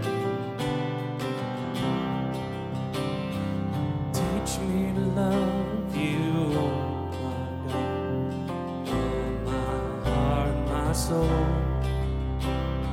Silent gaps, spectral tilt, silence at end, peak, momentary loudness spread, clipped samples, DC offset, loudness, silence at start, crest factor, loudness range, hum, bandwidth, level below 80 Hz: none; -6.5 dB/octave; 0 s; -12 dBFS; 6 LU; under 0.1%; under 0.1%; -28 LUFS; 0 s; 14 dB; 3 LU; none; 16 kHz; -36 dBFS